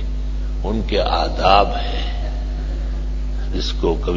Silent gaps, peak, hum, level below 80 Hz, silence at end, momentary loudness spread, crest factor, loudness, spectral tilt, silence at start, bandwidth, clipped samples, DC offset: none; 0 dBFS; none; -22 dBFS; 0 s; 12 LU; 18 dB; -21 LUFS; -6 dB/octave; 0 s; 7.4 kHz; under 0.1%; under 0.1%